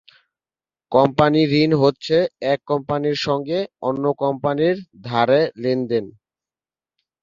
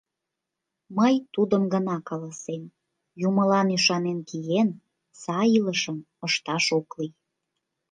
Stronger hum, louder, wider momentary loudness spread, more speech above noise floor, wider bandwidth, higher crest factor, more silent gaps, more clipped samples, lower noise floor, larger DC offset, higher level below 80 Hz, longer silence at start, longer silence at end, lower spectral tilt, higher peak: neither; first, -19 LUFS vs -25 LUFS; second, 9 LU vs 14 LU; first, over 71 dB vs 61 dB; second, 7.4 kHz vs 9.6 kHz; about the same, 18 dB vs 18 dB; neither; neither; first, under -90 dBFS vs -85 dBFS; neither; first, -58 dBFS vs -74 dBFS; about the same, 0.9 s vs 0.9 s; first, 1.15 s vs 0.8 s; first, -7 dB/octave vs -4.5 dB/octave; first, -2 dBFS vs -8 dBFS